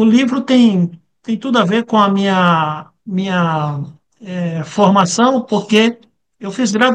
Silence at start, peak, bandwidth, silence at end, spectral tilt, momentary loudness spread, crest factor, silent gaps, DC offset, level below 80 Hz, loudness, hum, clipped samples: 0 s; 0 dBFS; 9.6 kHz; 0 s; -5.5 dB/octave; 14 LU; 14 dB; none; under 0.1%; -62 dBFS; -14 LUFS; none; under 0.1%